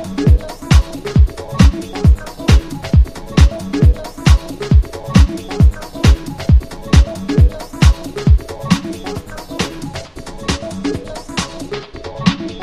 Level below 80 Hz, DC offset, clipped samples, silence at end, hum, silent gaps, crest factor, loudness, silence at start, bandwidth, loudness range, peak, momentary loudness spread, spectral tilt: -16 dBFS; 0.5%; under 0.1%; 0 s; none; none; 14 dB; -15 LUFS; 0 s; 13 kHz; 8 LU; 0 dBFS; 12 LU; -6.5 dB/octave